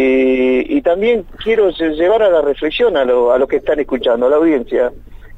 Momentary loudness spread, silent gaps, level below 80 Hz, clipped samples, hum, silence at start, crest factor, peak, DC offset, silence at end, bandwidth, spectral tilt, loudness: 5 LU; none; -38 dBFS; under 0.1%; none; 0 s; 10 dB; -2 dBFS; under 0.1%; 0 s; 7.8 kHz; -6.5 dB/octave; -14 LUFS